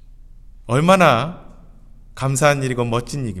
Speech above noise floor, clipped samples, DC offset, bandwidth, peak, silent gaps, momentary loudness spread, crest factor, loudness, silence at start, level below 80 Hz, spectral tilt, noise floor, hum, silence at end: 25 dB; under 0.1%; under 0.1%; 14 kHz; 0 dBFS; none; 13 LU; 20 dB; -18 LUFS; 0.1 s; -42 dBFS; -5.5 dB/octave; -42 dBFS; none; 0 s